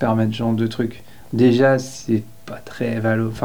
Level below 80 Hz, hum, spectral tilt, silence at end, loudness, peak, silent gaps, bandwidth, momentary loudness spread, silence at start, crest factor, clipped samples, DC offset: -52 dBFS; none; -7 dB/octave; 0 s; -20 LUFS; -4 dBFS; none; over 20 kHz; 13 LU; 0 s; 14 dB; under 0.1%; 1%